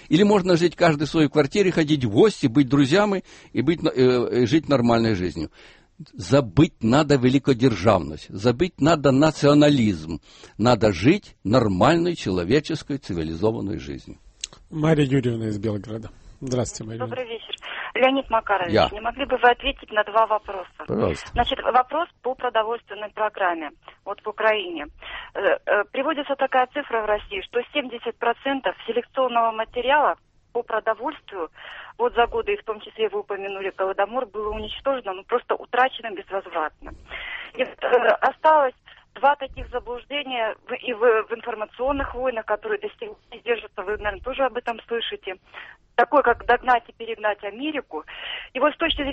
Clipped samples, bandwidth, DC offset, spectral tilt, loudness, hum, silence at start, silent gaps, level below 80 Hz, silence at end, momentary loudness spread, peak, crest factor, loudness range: under 0.1%; 8.4 kHz; under 0.1%; -6 dB/octave; -22 LUFS; none; 0.1 s; none; -46 dBFS; 0 s; 15 LU; -4 dBFS; 20 dB; 7 LU